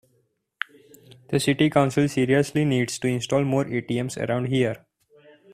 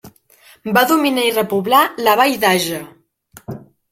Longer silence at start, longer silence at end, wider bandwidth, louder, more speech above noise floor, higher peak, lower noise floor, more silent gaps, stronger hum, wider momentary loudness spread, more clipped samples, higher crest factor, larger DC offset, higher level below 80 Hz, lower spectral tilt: first, 1.3 s vs 0.05 s; first, 0.75 s vs 0.35 s; about the same, 15 kHz vs 16.5 kHz; second, -23 LUFS vs -15 LUFS; first, 47 dB vs 34 dB; second, -4 dBFS vs 0 dBFS; first, -69 dBFS vs -49 dBFS; neither; neither; second, 13 LU vs 20 LU; neither; about the same, 20 dB vs 18 dB; neither; about the same, -58 dBFS vs -58 dBFS; first, -6 dB/octave vs -3.5 dB/octave